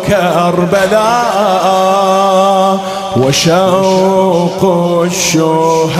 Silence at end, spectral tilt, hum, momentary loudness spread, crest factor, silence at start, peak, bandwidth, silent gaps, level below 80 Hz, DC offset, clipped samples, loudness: 0 s; -4.5 dB/octave; none; 3 LU; 10 dB; 0 s; 0 dBFS; 16 kHz; none; -44 dBFS; under 0.1%; under 0.1%; -10 LUFS